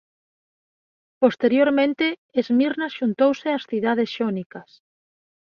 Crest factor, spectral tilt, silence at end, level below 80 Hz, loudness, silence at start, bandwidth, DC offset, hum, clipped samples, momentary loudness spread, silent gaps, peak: 20 dB; -6.5 dB/octave; 0.8 s; -70 dBFS; -21 LUFS; 1.2 s; 6.8 kHz; under 0.1%; none; under 0.1%; 8 LU; 2.18-2.29 s, 4.46-4.50 s; -4 dBFS